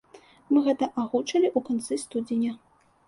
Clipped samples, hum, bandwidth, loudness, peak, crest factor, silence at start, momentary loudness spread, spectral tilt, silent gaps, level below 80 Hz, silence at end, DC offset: under 0.1%; none; 11.5 kHz; -26 LUFS; -10 dBFS; 16 dB; 0.15 s; 7 LU; -4.5 dB/octave; none; -70 dBFS; 0.5 s; under 0.1%